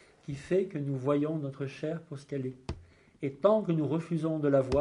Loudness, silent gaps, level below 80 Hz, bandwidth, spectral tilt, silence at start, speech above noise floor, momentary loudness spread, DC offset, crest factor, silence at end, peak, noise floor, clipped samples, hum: -31 LUFS; none; -54 dBFS; 11 kHz; -8.5 dB/octave; 0.3 s; 23 dB; 15 LU; under 0.1%; 20 dB; 0 s; -10 dBFS; -53 dBFS; under 0.1%; none